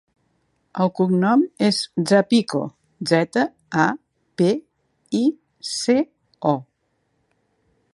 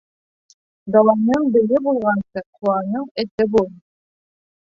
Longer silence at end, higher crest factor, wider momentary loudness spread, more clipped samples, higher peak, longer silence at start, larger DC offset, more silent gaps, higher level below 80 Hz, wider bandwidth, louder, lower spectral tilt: first, 1.3 s vs 1 s; about the same, 20 dB vs 18 dB; first, 13 LU vs 10 LU; neither; about the same, -2 dBFS vs -2 dBFS; about the same, 0.75 s vs 0.85 s; neither; second, none vs 2.46-2.53 s, 3.11-3.15 s, 3.31-3.38 s; second, -68 dBFS vs -56 dBFS; first, 11.5 kHz vs 7.4 kHz; second, -21 LUFS vs -18 LUFS; second, -5.5 dB/octave vs -8 dB/octave